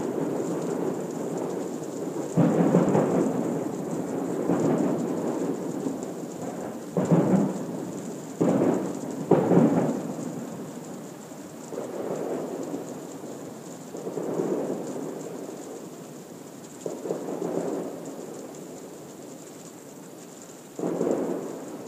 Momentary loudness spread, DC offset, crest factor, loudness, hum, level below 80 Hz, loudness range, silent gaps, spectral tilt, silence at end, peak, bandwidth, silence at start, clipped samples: 19 LU; under 0.1%; 22 dB; -28 LUFS; none; -70 dBFS; 10 LU; none; -7 dB/octave; 0 s; -6 dBFS; 15.5 kHz; 0 s; under 0.1%